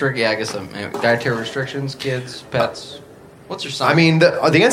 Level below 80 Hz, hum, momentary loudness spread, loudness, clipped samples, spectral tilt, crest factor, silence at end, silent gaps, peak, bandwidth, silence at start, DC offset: -58 dBFS; none; 15 LU; -18 LUFS; under 0.1%; -5.5 dB/octave; 18 dB; 0 s; none; 0 dBFS; 14.5 kHz; 0 s; under 0.1%